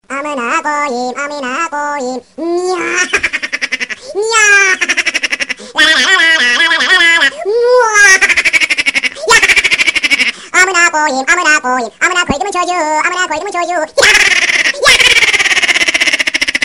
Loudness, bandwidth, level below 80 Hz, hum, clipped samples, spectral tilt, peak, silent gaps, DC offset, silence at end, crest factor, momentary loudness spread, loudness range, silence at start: -9 LUFS; 17.5 kHz; -42 dBFS; none; under 0.1%; 0 dB/octave; 0 dBFS; none; 0.2%; 0 s; 12 dB; 11 LU; 7 LU; 0.1 s